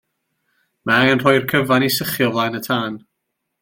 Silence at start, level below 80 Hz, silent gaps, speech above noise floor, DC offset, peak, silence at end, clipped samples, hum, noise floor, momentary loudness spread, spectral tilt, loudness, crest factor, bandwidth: 0.85 s; -56 dBFS; none; 59 dB; under 0.1%; -2 dBFS; 0.65 s; under 0.1%; none; -76 dBFS; 12 LU; -4.5 dB/octave; -17 LUFS; 18 dB; 17 kHz